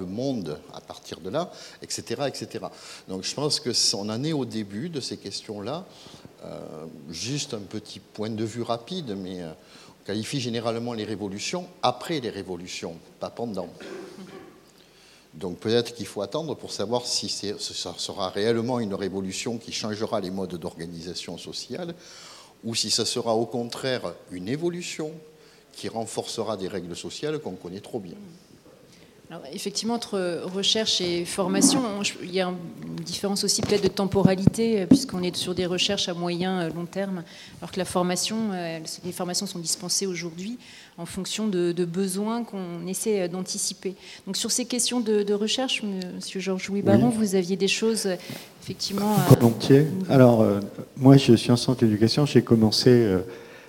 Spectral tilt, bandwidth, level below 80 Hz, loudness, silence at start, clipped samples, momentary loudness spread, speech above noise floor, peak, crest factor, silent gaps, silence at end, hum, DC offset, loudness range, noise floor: -4.5 dB/octave; 17 kHz; -60 dBFS; -25 LUFS; 0 s; under 0.1%; 18 LU; 28 dB; 0 dBFS; 26 dB; none; 0 s; none; under 0.1%; 12 LU; -54 dBFS